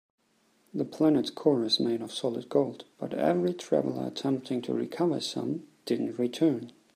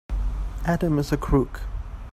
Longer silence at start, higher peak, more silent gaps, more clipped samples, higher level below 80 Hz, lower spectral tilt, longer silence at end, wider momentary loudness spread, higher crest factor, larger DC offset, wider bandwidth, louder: first, 0.75 s vs 0.1 s; about the same, -10 dBFS vs -8 dBFS; neither; neither; second, -74 dBFS vs -30 dBFS; second, -6 dB/octave vs -7.5 dB/octave; first, 0.25 s vs 0 s; second, 10 LU vs 13 LU; about the same, 20 dB vs 18 dB; neither; first, 15.5 kHz vs 14 kHz; second, -29 LUFS vs -26 LUFS